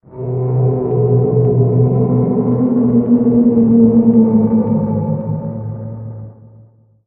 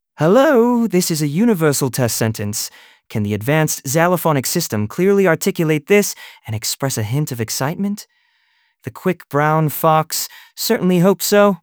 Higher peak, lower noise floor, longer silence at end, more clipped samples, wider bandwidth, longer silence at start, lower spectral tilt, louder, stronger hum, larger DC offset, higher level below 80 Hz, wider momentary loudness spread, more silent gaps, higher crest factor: about the same, 0 dBFS vs 0 dBFS; second, -45 dBFS vs -62 dBFS; first, 0.75 s vs 0.05 s; neither; second, 2.3 kHz vs over 20 kHz; about the same, 0.1 s vs 0.2 s; first, -15.5 dB/octave vs -5 dB/octave; first, -13 LUFS vs -17 LUFS; neither; neither; first, -44 dBFS vs -58 dBFS; first, 15 LU vs 10 LU; neither; about the same, 14 dB vs 16 dB